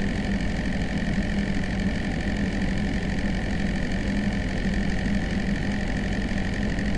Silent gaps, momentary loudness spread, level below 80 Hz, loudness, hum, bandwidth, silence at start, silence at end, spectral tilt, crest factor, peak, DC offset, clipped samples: none; 1 LU; -32 dBFS; -27 LUFS; none; 11 kHz; 0 s; 0 s; -6.5 dB/octave; 12 dB; -12 dBFS; under 0.1%; under 0.1%